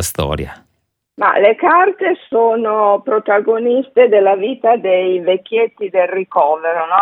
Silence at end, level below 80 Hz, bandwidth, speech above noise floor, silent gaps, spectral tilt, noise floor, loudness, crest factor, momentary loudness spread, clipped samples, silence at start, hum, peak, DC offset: 0 s; -42 dBFS; 18 kHz; 46 dB; none; -5 dB/octave; -59 dBFS; -14 LUFS; 14 dB; 6 LU; under 0.1%; 0 s; none; 0 dBFS; under 0.1%